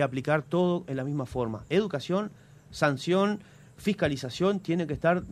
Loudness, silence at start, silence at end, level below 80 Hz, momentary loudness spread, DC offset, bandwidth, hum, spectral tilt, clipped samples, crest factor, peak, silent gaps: -28 LUFS; 0 s; 0 s; -56 dBFS; 6 LU; under 0.1%; 13.5 kHz; none; -6.5 dB/octave; under 0.1%; 20 dB; -8 dBFS; none